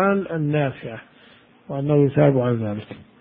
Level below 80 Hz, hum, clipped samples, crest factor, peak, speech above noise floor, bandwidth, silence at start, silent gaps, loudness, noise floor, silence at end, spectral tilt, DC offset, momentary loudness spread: -56 dBFS; none; under 0.1%; 18 dB; -4 dBFS; 31 dB; 3.9 kHz; 0 s; none; -21 LUFS; -51 dBFS; 0.15 s; -13 dB/octave; under 0.1%; 19 LU